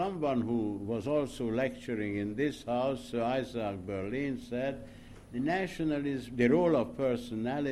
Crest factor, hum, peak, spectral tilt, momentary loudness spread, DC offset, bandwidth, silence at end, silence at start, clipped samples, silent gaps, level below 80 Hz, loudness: 18 dB; none; -14 dBFS; -7 dB/octave; 8 LU; under 0.1%; 13 kHz; 0 s; 0 s; under 0.1%; none; -56 dBFS; -33 LUFS